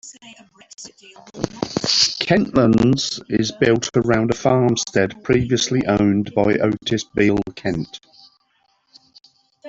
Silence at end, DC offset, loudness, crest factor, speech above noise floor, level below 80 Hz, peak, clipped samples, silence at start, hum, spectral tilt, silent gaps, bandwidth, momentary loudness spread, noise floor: 0 s; under 0.1%; -18 LUFS; 20 dB; 45 dB; -46 dBFS; 0 dBFS; under 0.1%; 0.05 s; none; -5 dB/octave; none; 8 kHz; 14 LU; -64 dBFS